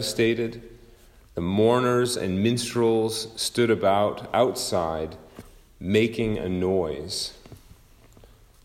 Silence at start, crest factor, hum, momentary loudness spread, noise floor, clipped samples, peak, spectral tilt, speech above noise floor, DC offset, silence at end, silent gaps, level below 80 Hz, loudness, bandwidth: 0 s; 18 dB; none; 11 LU; -52 dBFS; under 0.1%; -8 dBFS; -5 dB/octave; 29 dB; under 0.1%; 1.05 s; none; -52 dBFS; -24 LUFS; 16 kHz